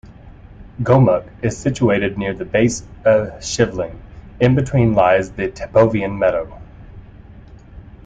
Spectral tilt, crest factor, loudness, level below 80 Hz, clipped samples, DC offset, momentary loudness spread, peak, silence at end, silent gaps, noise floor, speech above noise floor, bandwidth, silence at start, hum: -6.5 dB/octave; 16 dB; -17 LUFS; -40 dBFS; under 0.1%; under 0.1%; 11 LU; -2 dBFS; 0.25 s; none; -40 dBFS; 24 dB; 9.2 kHz; 0.1 s; none